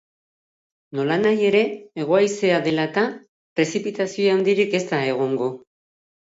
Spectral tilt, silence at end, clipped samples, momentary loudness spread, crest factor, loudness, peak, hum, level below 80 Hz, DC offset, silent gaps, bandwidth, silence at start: -5.5 dB/octave; 0.65 s; under 0.1%; 10 LU; 16 dB; -21 LUFS; -6 dBFS; none; -70 dBFS; under 0.1%; 3.29-3.56 s; 8 kHz; 0.95 s